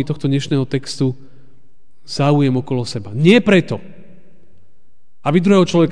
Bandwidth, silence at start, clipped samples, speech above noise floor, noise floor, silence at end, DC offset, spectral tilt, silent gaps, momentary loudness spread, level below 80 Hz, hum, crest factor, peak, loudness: 10 kHz; 0 s; under 0.1%; 45 dB; -60 dBFS; 0 s; 3%; -6.5 dB/octave; none; 13 LU; -54 dBFS; none; 18 dB; 0 dBFS; -16 LUFS